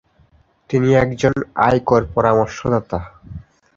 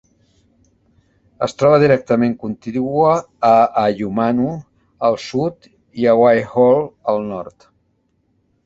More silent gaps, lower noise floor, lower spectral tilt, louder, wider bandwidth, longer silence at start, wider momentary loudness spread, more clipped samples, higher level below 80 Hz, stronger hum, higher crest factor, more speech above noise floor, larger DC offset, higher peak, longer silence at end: neither; second, -55 dBFS vs -64 dBFS; about the same, -7 dB/octave vs -7 dB/octave; about the same, -17 LUFS vs -16 LUFS; about the same, 7.6 kHz vs 8 kHz; second, 0.7 s vs 1.4 s; first, 21 LU vs 12 LU; neither; first, -40 dBFS vs -54 dBFS; neither; about the same, 16 dB vs 16 dB; second, 38 dB vs 48 dB; neither; about the same, -2 dBFS vs -2 dBFS; second, 0.35 s vs 1.15 s